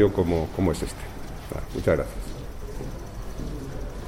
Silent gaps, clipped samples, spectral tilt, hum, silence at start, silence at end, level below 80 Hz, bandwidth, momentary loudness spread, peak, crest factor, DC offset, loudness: none; under 0.1%; -6.5 dB/octave; none; 0 s; 0 s; -36 dBFS; 16.5 kHz; 14 LU; -8 dBFS; 18 dB; under 0.1%; -29 LUFS